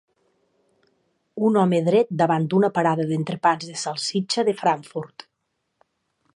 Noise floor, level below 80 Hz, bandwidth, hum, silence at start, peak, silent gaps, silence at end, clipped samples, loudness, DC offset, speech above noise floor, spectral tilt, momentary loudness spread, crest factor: -76 dBFS; -72 dBFS; 11 kHz; none; 1.35 s; -6 dBFS; none; 1.3 s; under 0.1%; -22 LUFS; under 0.1%; 55 dB; -5.5 dB/octave; 9 LU; 18 dB